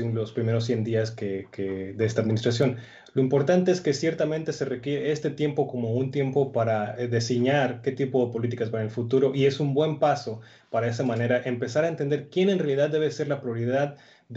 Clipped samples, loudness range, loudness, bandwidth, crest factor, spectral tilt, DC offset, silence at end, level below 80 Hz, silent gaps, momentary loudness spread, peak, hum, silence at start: under 0.1%; 1 LU; -26 LUFS; 8 kHz; 16 dB; -6.5 dB/octave; under 0.1%; 0 s; -68 dBFS; none; 7 LU; -10 dBFS; none; 0 s